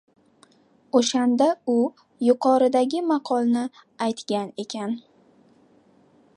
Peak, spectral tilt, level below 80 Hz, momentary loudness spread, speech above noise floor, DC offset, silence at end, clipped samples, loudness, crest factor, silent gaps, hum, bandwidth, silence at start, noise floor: -4 dBFS; -4.5 dB/octave; -78 dBFS; 12 LU; 36 dB; under 0.1%; 1.35 s; under 0.1%; -23 LUFS; 20 dB; none; none; 11 kHz; 0.95 s; -58 dBFS